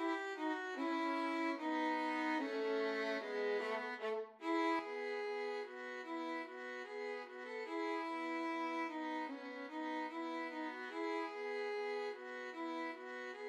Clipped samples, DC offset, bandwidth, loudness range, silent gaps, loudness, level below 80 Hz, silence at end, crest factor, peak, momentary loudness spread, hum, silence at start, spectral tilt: under 0.1%; under 0.1%; 11.5 kHz; 5 LU; none; -42 LUFS; under -90 dBFS; 0 s; 14 dB; -26 dBFS; 8 LU; none; 0 s; -3 dB/octave